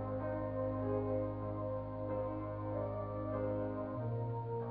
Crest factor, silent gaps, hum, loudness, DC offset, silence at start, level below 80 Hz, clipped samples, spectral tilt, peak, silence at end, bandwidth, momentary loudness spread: 14 dB; none; none; -40 LUFS; under 0.1%; 0 s; -56 dBFS; under 0.1%; -10 dB/octave; -26 dBFS; 0 s; 4.6 kHz; 4 LU